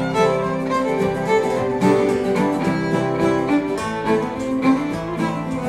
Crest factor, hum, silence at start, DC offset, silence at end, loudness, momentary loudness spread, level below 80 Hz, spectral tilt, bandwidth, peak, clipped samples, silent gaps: 16 dB; none; 0 s; under 0.1%; 0 s; -20 LUFS; 5 LU; -46 dBFS; -6.5 dB/octave; 13.5 kHz; -4 dBFS; under 0.1%; none